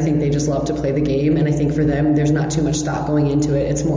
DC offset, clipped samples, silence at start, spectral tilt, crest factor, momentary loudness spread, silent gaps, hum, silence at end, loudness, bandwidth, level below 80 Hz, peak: under 0.1%; under 0.1%; 0 s; -7 dB/octave; 10 dB; 3 LU; none; none; 0 s; -18 LUFS; 7.6 kHz; -34 dBFS; -8 dBFS